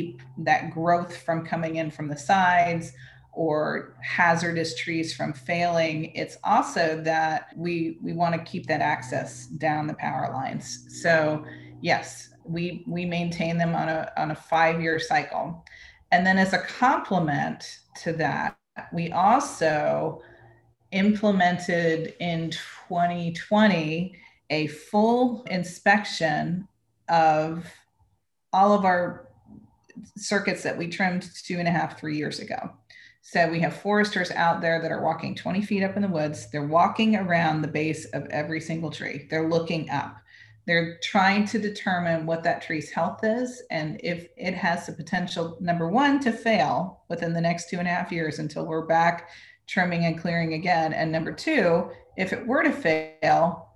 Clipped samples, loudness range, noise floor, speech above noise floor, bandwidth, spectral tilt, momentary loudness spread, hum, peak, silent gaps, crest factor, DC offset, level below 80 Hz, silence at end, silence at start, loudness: under 0.1%; 4 LU; -70 dBFS; 45 dB; 12 kHz; -5.5 dB/octave; 11 LU; none; -8 dBFS; none; 18 dB; under 0.1%; -62 dBFS; 0.1 s; 0 s; -25 LUFS